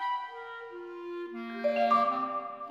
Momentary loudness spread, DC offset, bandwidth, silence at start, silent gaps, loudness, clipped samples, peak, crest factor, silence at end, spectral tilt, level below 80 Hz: 17 LU; under 0.1%; 12 kHz; 0 s; none; -31 LUFS; under 0.1%; -14 dBFS; 18 dB; 0 s; -5.5 dB/octave; -84 dBFS